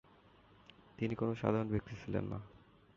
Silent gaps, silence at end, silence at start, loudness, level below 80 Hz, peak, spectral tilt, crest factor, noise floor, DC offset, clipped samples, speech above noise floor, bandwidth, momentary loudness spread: none; 0.4 s; 1 s; -38 LUFS; -60 dBFS; -18 dBFS; -7.5 dB/octave; 22 dB; -64 dBFS; under 0.1%; under 0.1%; 27 dB; 7.2 kHz; 15 LU